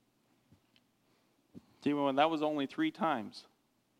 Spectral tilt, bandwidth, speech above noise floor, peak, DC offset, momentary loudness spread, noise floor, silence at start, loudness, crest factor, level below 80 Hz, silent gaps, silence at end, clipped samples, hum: -6 dB/octave; 11 kHz; 41 dB; -14 dBFS; under 0.1%; 11 LU; -73 dBFS; 1.55 s; -33 LUFS; 24 dB; -84 dBFS; none; 0.6 s; under 0.1%; none